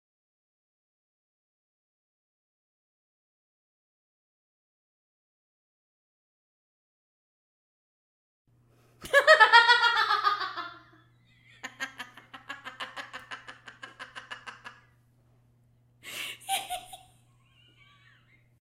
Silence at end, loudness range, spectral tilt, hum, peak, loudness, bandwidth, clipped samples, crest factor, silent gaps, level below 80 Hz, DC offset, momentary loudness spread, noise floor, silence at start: 1.7 s; 20 LU; 0 dB/octave; none; -4 dBFS; -22 LUFS; 16 kHz; under 0.1%; 28 dB; none; -72 dBFS; under 0.1%; 27 LU; -64 dBFS; 9.05 s